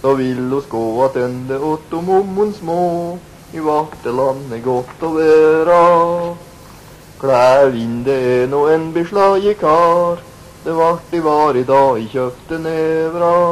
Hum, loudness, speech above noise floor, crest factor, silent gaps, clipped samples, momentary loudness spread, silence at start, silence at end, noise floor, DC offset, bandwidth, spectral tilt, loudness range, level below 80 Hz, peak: none; -15 LUFS; 24 dB; 12 dB; none; under 0.1%; 11 LU; 0.05 s; 0 s; -38 dBFS; under 0.1%; 13.5 kHz; -6.5 dB/octave; 5 LU; -48 dBFS; -2 dBFS